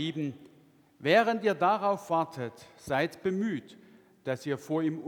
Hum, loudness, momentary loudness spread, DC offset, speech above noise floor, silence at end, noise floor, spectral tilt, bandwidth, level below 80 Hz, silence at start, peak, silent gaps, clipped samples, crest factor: none; -30 LUFS; 15 LU; under 0.1%; 31 dB; 0 s; -61 dBFS; -6 dB/octave; 19.5 kHz; -72 dBFS; 0 s; -10 dBFS; none; under 0.1%; 20 dB